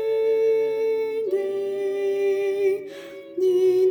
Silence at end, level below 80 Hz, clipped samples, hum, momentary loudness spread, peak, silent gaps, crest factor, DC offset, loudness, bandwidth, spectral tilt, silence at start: 0 s; -70 dBFS; under 0.1%; none; 8 LU; -12 dBFS; none; 10 dB; under 0.1%; -23 LUFS; 18.5 kHz; -5.5 dB/octave; 0 s